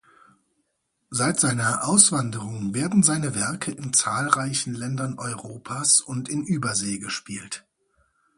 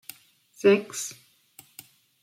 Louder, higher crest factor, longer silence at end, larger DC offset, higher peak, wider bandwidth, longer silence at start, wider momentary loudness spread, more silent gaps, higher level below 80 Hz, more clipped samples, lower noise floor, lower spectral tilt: first, -22 LUFS vs -25 LUFS; about the same, 24 dB vs 20 dB; second, 0.8 s vs 1.1 s; neither; first, 0 dBFS vs -8 dBFS; second, 11.5 kHz vs 16.5 kHz; first, 1.1 s vs 0.65 s; second, 14 LU vs 26 LU; neither; first, -62 dBFS vs -80 dBFS; neither; first, -75 dBFS vs -56 dBFS; about the same, -3 dB/octave vs -4 dB/octave